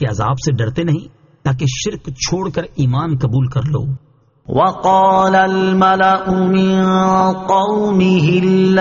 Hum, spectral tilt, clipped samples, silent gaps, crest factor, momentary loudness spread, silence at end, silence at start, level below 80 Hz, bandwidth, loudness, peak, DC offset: none; -6 dB/octave; under 0.1%; none; 12 dB; 9 LU; 0 s; 0 s; -42 dBFS; 7.4 kHz; -15 LUFS; -2 dBFS; under 0.1%